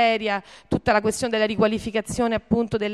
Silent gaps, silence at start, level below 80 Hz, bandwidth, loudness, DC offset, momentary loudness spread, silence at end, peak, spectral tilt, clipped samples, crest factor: none; 0 s; -46 dBFS; 13 kHz; -23 LUFS; under 0.1%; 6 LU; 0 s; -6 dBFS; -5 dB/octave; under 0.1%; 16 dB